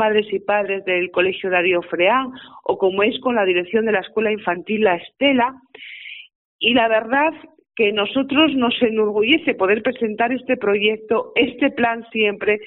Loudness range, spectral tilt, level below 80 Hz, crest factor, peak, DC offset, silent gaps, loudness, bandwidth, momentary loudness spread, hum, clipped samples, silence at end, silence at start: 2 LU; -1.5 dB/octave; -60 dBFS; 18 dB; -2 dBFS; under 0.1%; 6.35-6.59 s; -18 LUFS; 4.1 kHz; 7 LU; none; under 0.1%; 0 s; 0 s